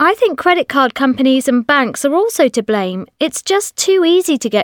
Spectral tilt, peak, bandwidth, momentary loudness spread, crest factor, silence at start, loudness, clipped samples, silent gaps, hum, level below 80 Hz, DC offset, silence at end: -3 dB/octave; 0 dBFS; 19 kHz; 5 LU; 14 dB; 0 s; -14 LUFS; under 0.1%; none; none; -58 dBFS; under 0.1%; 0 s